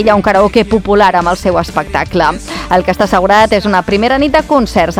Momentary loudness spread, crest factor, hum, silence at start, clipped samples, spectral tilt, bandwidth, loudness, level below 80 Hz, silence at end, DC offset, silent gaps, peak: 6 LU; 10 dB; none; 0 s; 1%; -5.5 dB/octave; 16 kHz; -10 LUFS; -30 dBFS; 0 s; under 0.1%; none; 0 dBFS